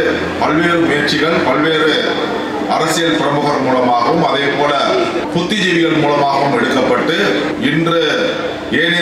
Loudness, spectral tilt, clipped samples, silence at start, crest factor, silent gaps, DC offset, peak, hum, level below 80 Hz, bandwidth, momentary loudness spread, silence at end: -14 LUFS; -4.5 dB/octave; under 0.1%; 0 s; 10 dB; none; under 0.1%; -2 dBFS; none; -48 dBFS; 14.5 kHz; 4 LU; 0 s